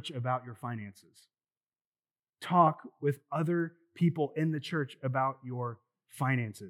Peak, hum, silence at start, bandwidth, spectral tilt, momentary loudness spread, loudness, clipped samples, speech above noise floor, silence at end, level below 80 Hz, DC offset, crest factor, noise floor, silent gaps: -10 dBFS; none; 0.05 s; 13.5 kHz; -7.5 dB/octave; 14 LU; -32 LUFS; under 0.1%; over 58 dB; 0 s; under -90 dBFS; under 0.1%; 24 dB; under -90 dBFS; 1.57-1.61 s, 1.85-1.92 s, 2.19-2.23 s